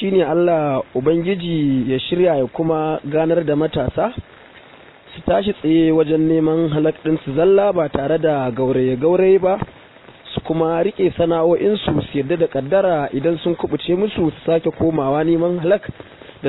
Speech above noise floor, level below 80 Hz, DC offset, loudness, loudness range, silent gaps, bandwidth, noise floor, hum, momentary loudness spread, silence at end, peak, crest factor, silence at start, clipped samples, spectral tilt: 27 dB; -46 dBFS; under 0.1%; -18 LUFS; 3 LU; none; 4.1 kHz; -44 dBFS; none; 6 LU; 0 s; -2 dBFS; 14 dB; 0 s; under 0.1%; -11.5 dB/octave